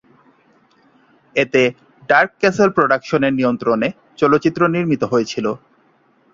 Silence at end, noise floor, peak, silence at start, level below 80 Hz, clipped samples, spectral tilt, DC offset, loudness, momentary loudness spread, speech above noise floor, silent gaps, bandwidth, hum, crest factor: 0.75 s; -57 dBFS; -2 dBFS; 1.35 s; -56 dBFS; under 0.1%; -6 dB/octave; under 0.1%; -17 LUFS; 8 LU; 41 dB; none; 7.6 kHz; none; 16 dB